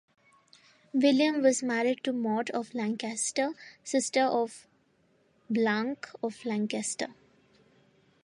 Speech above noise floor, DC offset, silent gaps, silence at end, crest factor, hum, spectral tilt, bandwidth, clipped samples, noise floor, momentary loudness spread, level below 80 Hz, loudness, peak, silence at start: 39 dB; under 0.1%; none; 1.1 s; 20 dB; none; -3.5 dB/octave; 11.5 kHz; under 0.1%; -68 dBFS; 11 LU; -82 dBFS; -29 LUFS; -10 dBFS; 0.95 s